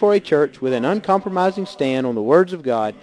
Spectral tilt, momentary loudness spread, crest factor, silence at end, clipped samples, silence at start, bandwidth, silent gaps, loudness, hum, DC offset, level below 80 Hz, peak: -7 dB/octave; 5 LU; 16 dB; 0.1 s; under 0.1%; 0 s; 10.5 kHz; none; -19 LUFS; none; under 0.1%; -64 dBFS; -2 dBFS